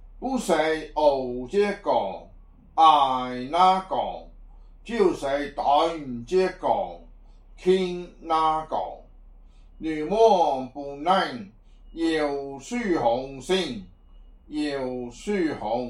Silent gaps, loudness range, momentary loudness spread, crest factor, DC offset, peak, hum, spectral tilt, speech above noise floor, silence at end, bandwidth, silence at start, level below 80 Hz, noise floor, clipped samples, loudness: none; 5 LU; 14 LU; 20 dB; under 0.1%; -4 dBFS; none; -5 dB/octave; 25 dB; 0 s; 13 kHz; 0 s; -48 dBFS; -49 dBFS; under 0.1%; -24 LUFS